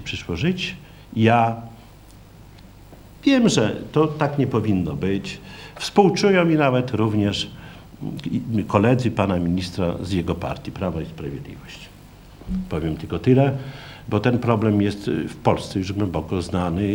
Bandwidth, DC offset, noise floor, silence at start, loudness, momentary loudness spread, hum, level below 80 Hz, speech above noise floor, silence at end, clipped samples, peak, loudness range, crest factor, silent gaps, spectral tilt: 16.5 kHz; under 0.1%; -45 dBFS; 0 s; -21 LUFS; 16 LU; none; -46 dBFS; 24 dB; 0 s; under 0.1%; 0 dBFS; 5 LU; 22 dB; none; -6.5 dB/octave